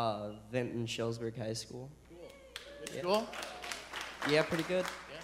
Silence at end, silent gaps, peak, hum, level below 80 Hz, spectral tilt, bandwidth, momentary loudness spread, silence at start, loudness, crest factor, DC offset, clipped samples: 0 s; none; -16 dBFS; none; -64 dBFS; -4.5 dB/octave; 16 kHz; 17 LU; 0 s; -37 LUFS; 22 dB; under 0.1%; under 0.1%